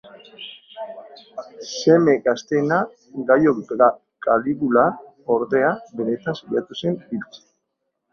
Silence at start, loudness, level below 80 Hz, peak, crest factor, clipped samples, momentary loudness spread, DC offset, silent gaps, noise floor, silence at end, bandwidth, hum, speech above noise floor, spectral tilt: 0.05 s; -20 LUFS; -62 dBFS; -2 dBFS; 18 dB; under 0.1%; 20 LU; under 0.1%; none; -77 dBFS; 0.75 s; 7 kHz; none; 56 dB; -6 dB/octave